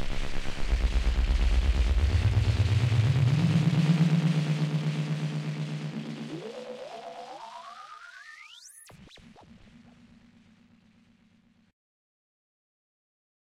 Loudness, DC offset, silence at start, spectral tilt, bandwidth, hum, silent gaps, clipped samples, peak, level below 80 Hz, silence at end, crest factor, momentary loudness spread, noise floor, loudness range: -27 LUFS; under 0.1%; 0 s; -7 dB/octave; 11.5 kHz; none; none; under 0.1%; -14 dBFS; -34 dBFS; 4.5 s; 14 dB; 21 LU; -63 dBFS; 21 LU